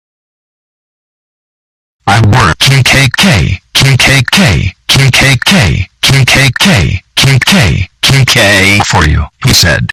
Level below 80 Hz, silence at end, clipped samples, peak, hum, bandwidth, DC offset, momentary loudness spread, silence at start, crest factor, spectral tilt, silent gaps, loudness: -24 dBFS; 0.05 s; 1%; 0 dBFS; none; 18 kHz; under 0.1%; 6 LU; 2.05 s; 8 dB; -4 dB/octave; none; -6 LUFS